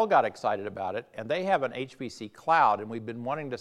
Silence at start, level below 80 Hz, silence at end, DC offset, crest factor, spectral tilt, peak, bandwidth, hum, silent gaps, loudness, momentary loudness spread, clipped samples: 0 s; -76 dBFS; 0 s; under 0.1%; 18 dB; -5.5 dB/octave; -10 dBFS; 11.5 kHz; none; none; -29 LUFS; 14 LU; under 0.1%